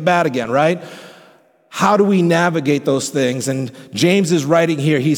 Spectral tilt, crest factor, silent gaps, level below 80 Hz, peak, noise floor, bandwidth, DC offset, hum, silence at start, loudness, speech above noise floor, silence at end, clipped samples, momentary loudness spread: -5.5 dB/octave; 14 dB; none; -62 dBFS; -2 dBFS; -50 dBFS; 18.5 kHz; under 0.1%; none; 0 s; -16 LUFS; 34 dB; 0 s; under 0.1%; 10 LU